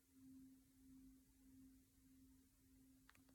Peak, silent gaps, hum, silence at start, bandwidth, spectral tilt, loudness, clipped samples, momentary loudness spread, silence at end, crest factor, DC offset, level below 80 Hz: -50 dBFS; none; none; 0 s; 17.5 kHz; -4.5 dB/octave; -68 LUFS; under 0.1%; 3 LU; 0 s; 20 dB; under 0.1%; -80 dBFS